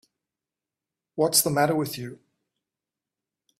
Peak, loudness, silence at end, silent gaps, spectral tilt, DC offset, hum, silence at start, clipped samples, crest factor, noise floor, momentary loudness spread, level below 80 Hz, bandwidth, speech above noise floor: -6 dBFS; -23 LUFS; 1.45 s; none; -3.5 dB/octave; under 0.1%; none; 1.15 s; under 0.1%; 22 dB; -89 dBFS; 18 LU; -68 dBFS; 15.5 kHz; 65 dB